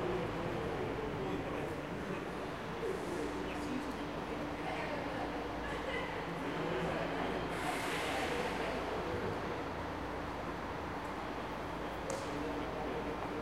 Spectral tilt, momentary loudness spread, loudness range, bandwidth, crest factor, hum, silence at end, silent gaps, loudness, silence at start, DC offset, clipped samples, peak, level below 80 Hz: -5.5 dB/octave; 5 LU; 3 LU; 16.5 kHz; 18 dB; none; 0 s; none; -39 LUFS; 0 s; under 0.1%; under 0.1%; -22 dBFS; -54 dBFS